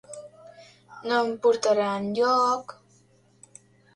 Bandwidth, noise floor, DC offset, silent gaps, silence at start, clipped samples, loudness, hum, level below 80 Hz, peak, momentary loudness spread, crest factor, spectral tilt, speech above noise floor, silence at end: 11 kHz; -60 dBFS; under 0.1%; none; 0.1 s; under 0.1%; -24 LUFS; none; -72 dBFS; -10 dBFS; 21 LU; 16 dB; -4 dB/octave; 37 dB; 1.25 s